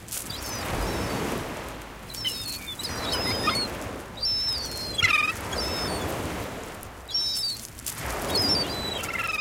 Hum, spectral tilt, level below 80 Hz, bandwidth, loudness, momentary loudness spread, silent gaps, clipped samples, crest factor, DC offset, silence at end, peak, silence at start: none; -2.5 dB/octave; -44 dBFS; 17 kHz; -27 LUFS; 13 LU; none; under 0.1%; 20 dB; under 0.1%; 0 s; -10 dBFS; 0 s